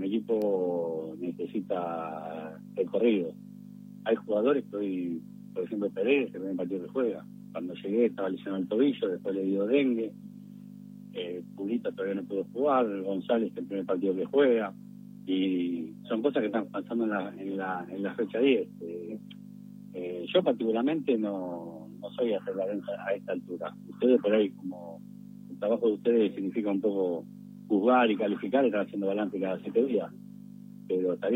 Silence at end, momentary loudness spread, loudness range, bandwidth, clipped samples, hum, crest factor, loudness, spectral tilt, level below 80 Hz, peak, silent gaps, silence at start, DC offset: 0 s; 18 LU; 4 LU; 15.5 kHz; under 0.1%; 50 Hz at -50 dBFS; 18 dB; -30 LUFS; -8 dB/octave; -78 dBFS; -12 dBFS; none; 0 s; under 0.1%